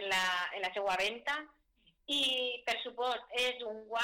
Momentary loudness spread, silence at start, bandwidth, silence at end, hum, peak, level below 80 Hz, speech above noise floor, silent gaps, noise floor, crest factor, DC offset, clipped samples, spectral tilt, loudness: 8 LU; 0 s; 18 kHz; 0 s; none; -26 dBFS; -70 dBFS; 36 dB; none; -71 dBFS; 10 dB; under 0.1%; under 0.1%; -1 dB/octave; -34 LUFS